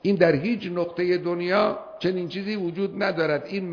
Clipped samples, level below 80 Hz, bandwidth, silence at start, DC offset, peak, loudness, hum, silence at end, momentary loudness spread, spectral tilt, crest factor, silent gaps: under 0.1%; -62 dBFS; 5.4 kHz; 0.05 s; under 0.1%; -6 dBFS; -25 LUFS; none; 0 s; 8 LU; -7.5 dB/octave; 18 dB; none